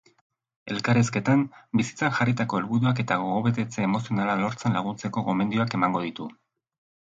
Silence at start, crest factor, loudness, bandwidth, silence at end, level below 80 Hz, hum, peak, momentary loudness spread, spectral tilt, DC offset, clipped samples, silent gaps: 0.65 s; 18 dB; -25 LUFS; 8 kHz; 0.75 s; -62 dBFS; none; -8 dBFS; 7 LU; -6.5 dB/octave; under 0.1%; under 0.1%; none